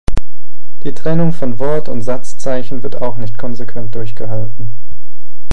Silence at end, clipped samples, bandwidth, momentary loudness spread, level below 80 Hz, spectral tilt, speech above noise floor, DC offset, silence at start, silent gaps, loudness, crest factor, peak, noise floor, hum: 0.05 s; 1%; 12 kHz; 12 LU; -32 dBFS; -7.5 dB/octave; 32 dB; 70%; 0.05 s; none; -22 LUFS; 18 dB; 0 dBFS; -53 dBFS; none